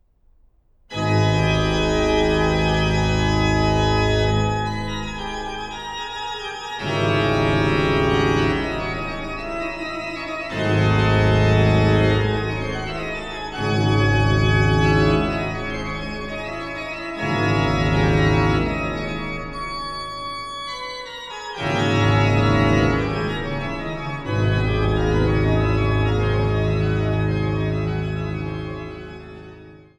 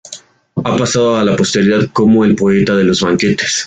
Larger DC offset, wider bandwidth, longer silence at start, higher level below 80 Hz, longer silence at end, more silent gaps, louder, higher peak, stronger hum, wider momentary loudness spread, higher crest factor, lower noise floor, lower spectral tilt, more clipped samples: neither; about the same, 9.6 kHz vs 9.4 kHz; first, 0.9 s vs 0.05 s; first, -32 dBFS vs -44 dBFS; first, 0.2 s vs 0 s; neither; second, -21 LUFS vs -12 LUFS; about the same, -4 dBFS vs -2 dBFS; neither; about the same, 12 LU vs 10 LU; first, 16 dB vs 10 dB; first, -56 dBFS vs -36 dBFS; first, -6.5 dB/octave vs -5 dB/octave; neither